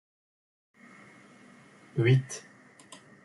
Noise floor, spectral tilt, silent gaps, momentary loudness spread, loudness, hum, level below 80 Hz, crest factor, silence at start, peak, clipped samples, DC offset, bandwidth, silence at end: -55 dBFS; -6.5 dB/octave; none; 27 LU; -28 LUFS; none; -72 dBFS; 20 dB; 1.95 s; -12 dBFS; under 0.1%; under 0.1%; 11.5 kHz; 0.85 s